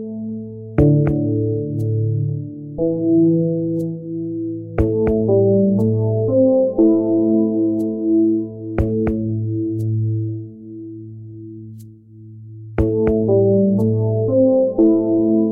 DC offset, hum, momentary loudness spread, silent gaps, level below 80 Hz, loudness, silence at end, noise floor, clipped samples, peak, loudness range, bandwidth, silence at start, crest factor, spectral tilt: under 0.1%; none; 17 LU; none; -38 dBFS; -18 LUFS; 0 s; -40 dBFS; under 0.1%; -2 dBFS; 8 LU; 2.8 kHz; 0 s; 14 dB; -12.5 dB/octave